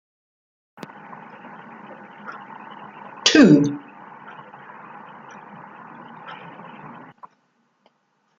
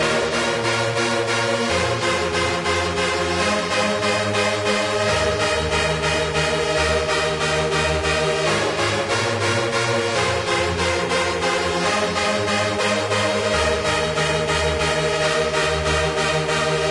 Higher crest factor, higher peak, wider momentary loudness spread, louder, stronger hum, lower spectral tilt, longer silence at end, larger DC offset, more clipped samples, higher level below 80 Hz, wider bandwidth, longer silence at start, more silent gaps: first, 24 dB vs 14 dB; first, 0 dBFS vs -6 dBFS; first, 27 LU vs 1 LU; first, -15 LUFS vs -20 LUFS; neither; about the same, -4.5 dB/octave vs -3.5 dB/octave; first, 2.05 s vs 0 s; neither; neither; second, -66 dBFS vs -40 dBFS; second, 7.8 kHz vs 11.5 kHz; first, 2.25 s vs 0 s; neither